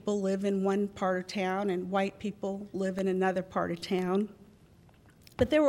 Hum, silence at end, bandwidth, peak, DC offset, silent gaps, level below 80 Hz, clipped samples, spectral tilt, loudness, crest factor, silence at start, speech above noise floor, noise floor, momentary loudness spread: none; 0 s; 13 kHz; -12 dBFS; under 0.1%; none; -58 dBFS; under 0.1%; -6.5 dB/octave; -31 LUFS; 18 dB; 0.05 s; 29 dB; -59 dBFS; 7 LU